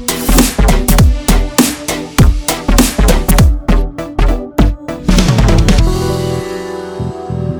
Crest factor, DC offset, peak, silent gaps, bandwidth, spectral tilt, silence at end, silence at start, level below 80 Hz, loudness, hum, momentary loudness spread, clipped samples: 10 dB; under 0.1%; 0 dBFS; none; over 20 kHz; -5 dB/octave; 0 s; 0 s; -14 dBFS; -13 LUFS; none; 10 LU; 0.2%